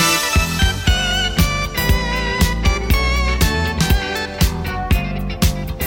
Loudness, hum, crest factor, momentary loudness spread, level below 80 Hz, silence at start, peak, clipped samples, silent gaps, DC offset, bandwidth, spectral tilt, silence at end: -18 LUFS; none; 16 dB; 3 LU; -20 dBFS; 0 s; -2 dBFS; under 0.1%; none; under 0.1%; 17 kHz; -4 dB/octave; 0 s